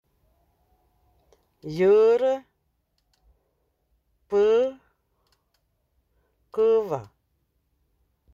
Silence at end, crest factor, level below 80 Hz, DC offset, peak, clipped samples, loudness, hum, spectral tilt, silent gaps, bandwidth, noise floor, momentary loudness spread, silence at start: 1.3 s; 16 dB; -64 dBFS; under 0.1%; -10 dBFS; under 0.1%; -22 LUFS; none; -7 dB/octave; none; 7.4 kHz; -73 dBFS; 16 LU; 1.65 s